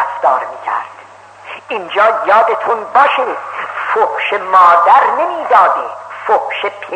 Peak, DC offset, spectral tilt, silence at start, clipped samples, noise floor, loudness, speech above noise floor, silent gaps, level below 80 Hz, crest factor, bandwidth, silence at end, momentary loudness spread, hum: 0 dBFS; under 0.1%; -3 dB/octave; 0 s; under 0.1%; -37 dBFS; -12 LUFS; 25 dB; none; -70 dBFS; 12 dB; 9.2 kHz; 0 s; 14 LU; none